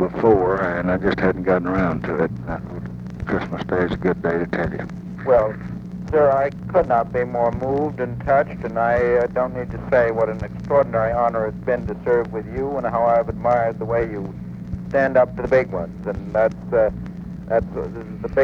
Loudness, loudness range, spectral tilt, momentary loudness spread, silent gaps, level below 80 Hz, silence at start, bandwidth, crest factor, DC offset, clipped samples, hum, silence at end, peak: -21 LUFS; 3 LU; -9 dB/octave; 12 LU; none; -40 dBFS; 0 s; 7 kHz; 18 dB; under 0.1%; under 0.1%; none; 0 s; -4 dBFS